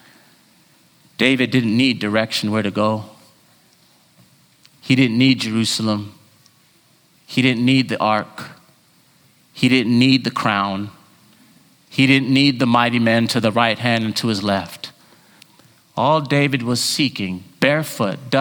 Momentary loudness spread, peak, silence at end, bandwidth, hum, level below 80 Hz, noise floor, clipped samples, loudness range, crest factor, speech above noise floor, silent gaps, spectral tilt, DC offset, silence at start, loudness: 13 LU; 0 dBFS; 0 s; over 20 kHz; none; -62 dBFS; -55 dBFS; under 0.1%; 4 LU; 20 dB; 38 dB; none; -5 dB/octave; under 0.1%; 1.2 s; -17 LUFS